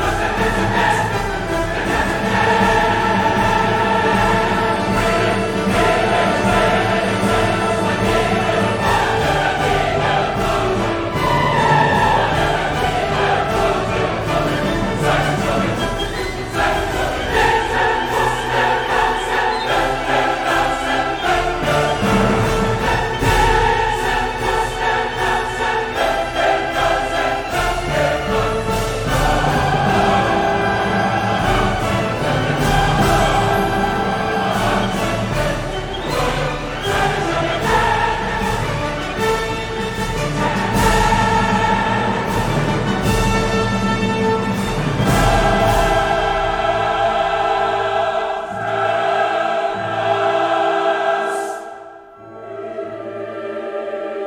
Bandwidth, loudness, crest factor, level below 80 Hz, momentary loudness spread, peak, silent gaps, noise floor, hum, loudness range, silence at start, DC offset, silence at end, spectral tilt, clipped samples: over 20 kHz; -17 LUFS; 16 dB; -30 dBFS; 6 LU; -2 dBFS; none; -38 dBFS; none; 3 LU; 0 s; under 0.1%; 0 s; -5 dB/octave; under 0.1%